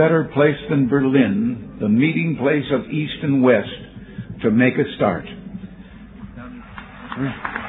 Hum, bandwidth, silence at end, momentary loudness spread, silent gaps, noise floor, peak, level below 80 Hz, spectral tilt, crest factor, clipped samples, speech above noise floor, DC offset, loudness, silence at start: none; 4 kHz; 0 s; 20 LU; none; -39 dBFS; -2 dBFS; -48 dBFS; -11 dB/octave; 18 dB; under 0.1%; 21 dB; under 0.1%; -19 LUFS; 0 s